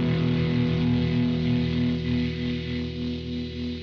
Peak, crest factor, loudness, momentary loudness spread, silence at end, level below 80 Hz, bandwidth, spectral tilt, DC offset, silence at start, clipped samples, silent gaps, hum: -12 dBFS; 12 dB; -26 LUFS; 8 LU; 0 s; -40 dBFS; 6.4 kHz; -8.5 dB/octave; under 0.1%; 0 s; under 0.1%; none; none